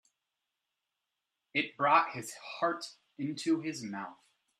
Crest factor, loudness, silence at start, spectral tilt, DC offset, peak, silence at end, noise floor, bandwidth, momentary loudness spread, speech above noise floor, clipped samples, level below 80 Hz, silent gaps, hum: 22 dB; -33 LUFS; 1.55 s; -4 dB/octave; under 0.1%; -12 dBFS; 0.45 s; -87 dBFS; 14 kHz; 16 LU; 54 dB; under 0.1%; -84 dBFS; none; none